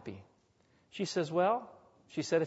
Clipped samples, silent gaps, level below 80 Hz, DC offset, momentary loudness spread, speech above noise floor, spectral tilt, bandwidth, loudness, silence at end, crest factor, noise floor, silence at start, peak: under 0.1%; none; -78 dBFS; under 0.1%; 21 LU; 38 dB; -5 dB/octave; 8 kHz; -34 LUFS; 0 s; 18 dB; -70 dBFS; 0.05 s; -18 dBFS